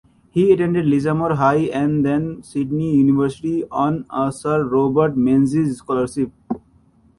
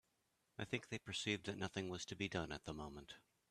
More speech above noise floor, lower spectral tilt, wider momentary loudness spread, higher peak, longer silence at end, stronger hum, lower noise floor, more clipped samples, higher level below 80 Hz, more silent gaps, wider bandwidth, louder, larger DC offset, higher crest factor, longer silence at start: about the same, 37 dB vs 37 dB; first, -8 dB/octave vs -4 dB/octave; second, 9 LU vs 14 LU; first, -2 dBFS vs -26 dBFS; first, 0.6 s vs 0.3 s; neither; second, -54 dBFS vs -84 dBFS; neither; first, -50 dBFS vs -68 dBFS; neither; second, 11.5 kHz vs 13.5 kHz; first, -19 LUFS vs -46 LUFS; neither; second, 16 dB vs 22 dB; second, 0.35 s vs 0.6 s